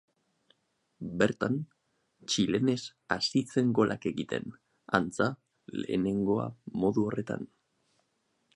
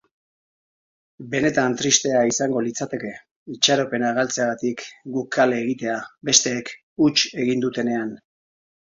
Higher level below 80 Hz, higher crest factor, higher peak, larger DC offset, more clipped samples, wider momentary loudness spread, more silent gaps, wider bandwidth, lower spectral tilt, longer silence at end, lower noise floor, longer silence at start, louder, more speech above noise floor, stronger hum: about the same, -64 dBFS vs -62 dBFS; about the same, 26 dB vs 22 dB; second, -6 dBFS vs 0 dBFS; neither; neither; about the same, 13 LU vs 13 LU; second, none vs 3.31-3.46 s, 6.83-6.96 s; first, 11.5 kHz vs 7.8 kHz; first, -5.5 dB/octave vs -2.5 dB/octave; first, 1.1 s vs 0.7 s; second, -76 dBFS vs under -90 dBFS; second, 1 s vs 1.2 s; second, -31 LUFS vs -21 LUFS; second, 46 dB vs over 68 dB; neither